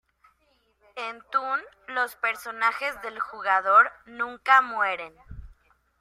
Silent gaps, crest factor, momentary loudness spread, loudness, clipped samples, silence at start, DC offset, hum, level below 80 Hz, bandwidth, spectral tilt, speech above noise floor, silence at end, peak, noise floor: none; 22 dB; 16 LU; -24 LUFS; under 0.1%; 0.95 s; under 0.1%; none; -56 dBFS; 16 kHz; -2.5 dB/octave; 42 dB; 0.5 s; -4 dBFS; -68 dBFS